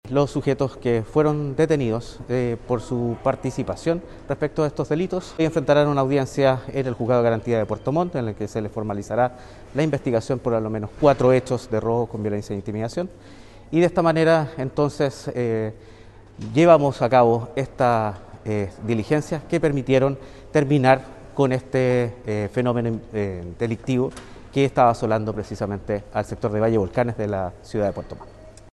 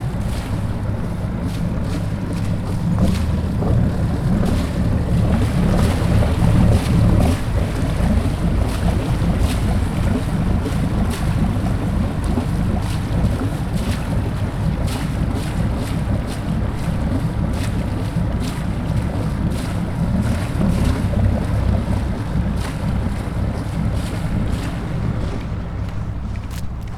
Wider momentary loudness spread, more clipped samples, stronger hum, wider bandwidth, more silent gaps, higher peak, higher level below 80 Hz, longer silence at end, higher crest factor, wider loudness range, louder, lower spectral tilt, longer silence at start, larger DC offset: first, 10 LU vs 6 LU; neither; neither; second, 12 kHz vs 14.5 kHz; neither; about the same, -2 dBFS vs -2 dBFS; second, -46 dBFS vs -24 dBFS; about the same, 0.05 s vs 0 s; about the same, 20 dB vs 16 dB; about the same, 4 LU vs 5 LU; about the same, -22 LUFS vs -21 LUFS; about the same, -7.5 dB/octave vs -7.5 dB/octave; about the same, 0.05 s vs 0 s; neither